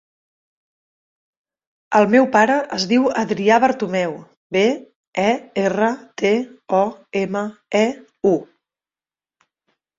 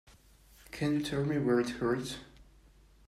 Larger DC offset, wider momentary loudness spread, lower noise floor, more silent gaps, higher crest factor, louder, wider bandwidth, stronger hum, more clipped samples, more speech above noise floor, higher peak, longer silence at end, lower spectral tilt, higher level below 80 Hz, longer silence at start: neither; second, 9 LU vs 14 LU; first, under -90 dBFS vs -60 dBFS; first, 4.37-4.50 s, 4.95-5.12 s vs none; about the same, 20 dB vs 16 dB; first, -19 LUFS vs -32 LUFS; second, 7.8 kHz vs 14.5 kHz; neither; neither; first, over 72 dB vs 29 dB; first, 0 dBFS vs -18 dBFS; first, 1.55 s vs 0.65 s; about the same, -5 dB/octave vs -6 dB/octave; about the same, -62 dBFS vs -58 dBFS; first, 1.9 s vs 0.7 s